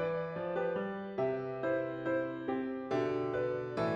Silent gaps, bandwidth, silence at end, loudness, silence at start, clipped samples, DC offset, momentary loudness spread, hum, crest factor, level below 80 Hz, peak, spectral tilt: none; 7.6 kHz; 0 s; -36 LUFS; 0 s; under 0.1%; under 0.1%; 3 LU; none; 14 dB; -68 dBFS; -22 dBFS; -8 dB/octave